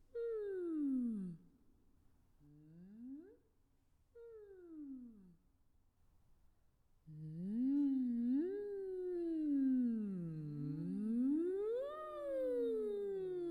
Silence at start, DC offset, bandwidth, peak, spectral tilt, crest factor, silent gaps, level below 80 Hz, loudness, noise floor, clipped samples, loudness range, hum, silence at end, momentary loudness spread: 0.15 s; under 0.1%; 9.4 kHz; -30 dBFS; -10 dB/octave; 12 dB; none; -74 dBFS; -40 LUFS; -75 dBFS; under 0.1%; 20 LU; none; 0 s; 20 LU